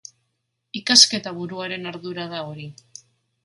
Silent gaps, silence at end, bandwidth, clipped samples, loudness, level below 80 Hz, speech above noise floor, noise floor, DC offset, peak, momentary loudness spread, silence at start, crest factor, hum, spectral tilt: none; 0.7 s; 16 kHz; under 0.1%; -18 LUFS; -70 dBFS; 53 dB; -75 dBFS; under 0.1%; 0 dBFS; 22 LU; 0.75 s; 24 dB; none; -1.5 dB/octave